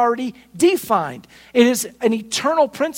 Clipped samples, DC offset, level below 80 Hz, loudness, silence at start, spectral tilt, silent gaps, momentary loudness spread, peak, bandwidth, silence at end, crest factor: under 0.1%; under 0.1%; -62 dBFS; -19 LUFS; 0 s; -3.5 dB/octave; none; 11 LU; -2 dBFS; 16.5 kHz; 0 s; 18 dB